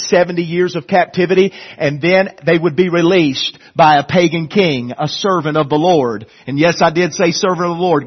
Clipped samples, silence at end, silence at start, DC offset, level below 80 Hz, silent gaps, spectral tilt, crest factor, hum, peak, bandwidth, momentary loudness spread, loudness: under 0.1%; 0 s; 0 s; under 0.1%; -54 dBFS; none; -5.5 dB/octave; 14 dB; none; 0 dBFS; 6.4 kHz; 8 LU; -14 LUFS